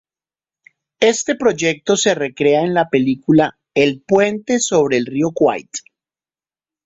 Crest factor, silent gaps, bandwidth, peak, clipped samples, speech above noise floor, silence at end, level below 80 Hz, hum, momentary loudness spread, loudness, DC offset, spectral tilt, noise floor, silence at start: 16 dB; none; 8.2 kHz; -2 dBFS; under 0.1%; over 74 dB; 1.05 s; -58 dBFS; none; 4 LU; -16 LUFS; under 0.1%; -4 dB/octave; under -90 dBFS; 1 s